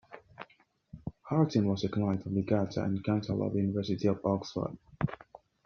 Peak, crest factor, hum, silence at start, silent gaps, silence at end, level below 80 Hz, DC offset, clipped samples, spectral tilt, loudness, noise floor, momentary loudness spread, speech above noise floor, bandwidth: -14 dBFS; 18 dB; none; 0.1 s; none; 0.5 s; -60 dBFS; under 0.1%; under 0.1%; -7.5 dB/octave; -32 LUFS; -65 dBFS; 20 LU; 35 dB; 6.8 kHz